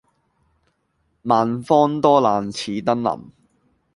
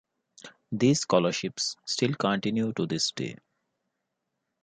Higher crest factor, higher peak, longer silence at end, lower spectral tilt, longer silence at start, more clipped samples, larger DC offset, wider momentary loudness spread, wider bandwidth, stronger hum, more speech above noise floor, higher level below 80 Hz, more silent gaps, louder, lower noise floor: about the same, 20 dB vs 22 dB; first, -2 dBFS vs -8 dBFS; second, 0.65 s vs 1.25 s; first, -6.5 dB/octave vs -4.5 dB/octave; first, 1.25 s vs 0.45 s; neither; neither; about the same, 10 LU vs 8 LU; first, 11.5 kHz vs 9.6 kHz; neither; second, 50 dB vs 55 dB; first, -60 dBFS vs -70 dBFS; neither; first, -19 LUFS vs -27 LUFS; second, -68 dBFS vs -82 dBFS